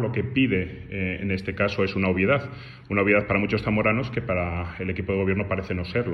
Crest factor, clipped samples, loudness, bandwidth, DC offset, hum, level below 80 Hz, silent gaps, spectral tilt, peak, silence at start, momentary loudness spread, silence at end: 18 dB; under 0.1%; -25 LUFS; 6.4 kHz; under 0.1%; none; -48 dBFS; none; -8.5 dB/octave; -8 dBFS; 0 s; 9 LU; 0 s